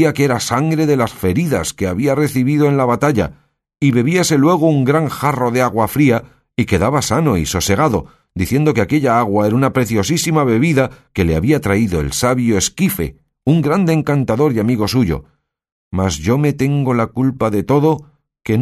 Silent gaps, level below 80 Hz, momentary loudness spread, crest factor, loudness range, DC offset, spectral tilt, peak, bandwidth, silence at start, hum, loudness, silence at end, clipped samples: 15.72-15.91 s; -38 dBFS; 6 LU; 14 dB; 2 LU; under 0.1%; -6 dB/octave; 0 dBFS; 13.5 kHz; 0 s; none; -15 LUFS; 0 s; under 0.1%